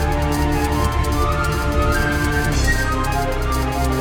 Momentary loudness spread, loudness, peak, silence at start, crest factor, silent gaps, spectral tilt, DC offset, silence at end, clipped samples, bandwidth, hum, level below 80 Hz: 3 LU; -19 LUFS; -4 dBFS; 0 s; 14 dB; none; -5.5 dB/octave; under 0.1%; 0 s; under 0.1%; 20 kHz; none; -22 dBFS